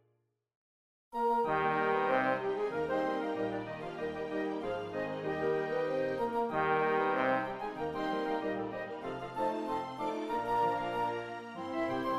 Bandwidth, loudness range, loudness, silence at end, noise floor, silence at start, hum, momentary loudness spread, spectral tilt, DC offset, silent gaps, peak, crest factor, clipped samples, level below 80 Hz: 13.5 kHz; 3 LU; -34 LUFS; 0 s; -77 dBFS; 1.1 s; none; 9 LU; -6.5 dB/octave; under 0.1%; none; -18 dBFS; 16 dB; under 0.1%; -64 dBFS